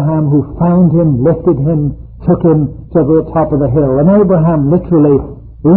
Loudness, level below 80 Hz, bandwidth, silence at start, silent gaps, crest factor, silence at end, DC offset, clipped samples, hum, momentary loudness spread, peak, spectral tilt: -11 LUFS; -30 dBFS; 2.9 kHz; 0 s; none; 10 dB; 0 s; under 0.1%; under 0.1%; none; 6 LU; 0 dBFS; -16 dB/octave